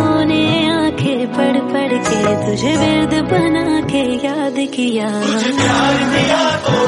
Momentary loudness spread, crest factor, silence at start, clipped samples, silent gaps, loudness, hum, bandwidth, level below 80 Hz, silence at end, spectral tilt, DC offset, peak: 4 LU; 14 dB; 0 s; under 0.1%; none; -15 LUFS; none; 11.5 kHz; -42 dBFS; 0 s; -5 dB/octave; under 0.1%; -2 dBFS